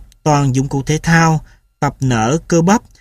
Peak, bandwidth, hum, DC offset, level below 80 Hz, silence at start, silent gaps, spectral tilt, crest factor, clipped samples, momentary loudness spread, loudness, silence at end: 0 dBFS; 13.5 kHz; none; under 0.1%; -38 dBFS; 0 s; none; -5.5 dB/octave; 14 dB; under 0.1%; 8 LU; -15 LUFS; 0.2 s